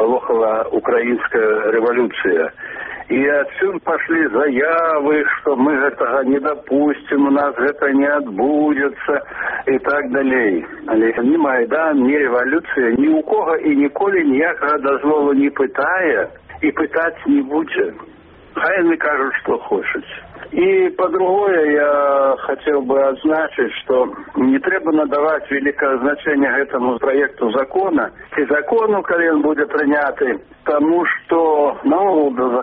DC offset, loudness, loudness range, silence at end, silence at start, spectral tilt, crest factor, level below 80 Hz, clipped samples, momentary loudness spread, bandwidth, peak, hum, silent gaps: under 0.1%; -16 LUFS; 2 LU; 0 s; 0 s; -3.5 dB/octave; 12 dB; -54 dBFS; under 0.1%; 6 LU; 4.4 kHz; -4 dBFS; none; none